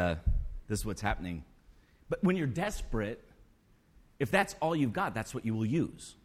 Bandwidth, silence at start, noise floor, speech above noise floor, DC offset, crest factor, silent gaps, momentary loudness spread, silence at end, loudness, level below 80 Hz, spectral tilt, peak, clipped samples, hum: 15.5 kHz; 0 s; -64 dBFS; 32 dB; under 0.1%; 20 dB; none; 9 LU; 0.1 s; -33 LUFS; -42 dBFS; -6 dB/octave; -14 dBFS; under 0.1%; none